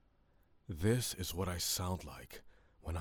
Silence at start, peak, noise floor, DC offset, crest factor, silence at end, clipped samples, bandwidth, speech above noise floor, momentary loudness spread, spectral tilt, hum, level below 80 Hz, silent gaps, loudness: 0.7 s; -18 dBFS; -70 dBFS; under 0.1%; 22 dB; 0 s; under 0.1%; over 20 kHz; 32 dB; 18 LU; -4 dB/octave; none; -56 dBFS; none; -37 LUFS